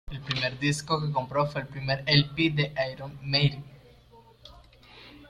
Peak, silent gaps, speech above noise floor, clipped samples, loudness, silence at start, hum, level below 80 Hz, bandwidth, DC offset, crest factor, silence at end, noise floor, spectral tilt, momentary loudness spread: -8 dBFS; none; 28 dB; under 0.1%; -27 LUFS; 0.05 s; none; -52 dBFS; 11.5 kHz; under 0.1%; 20 dB; 0 s; -55 dBFS; -5 dB/octave; 10 LU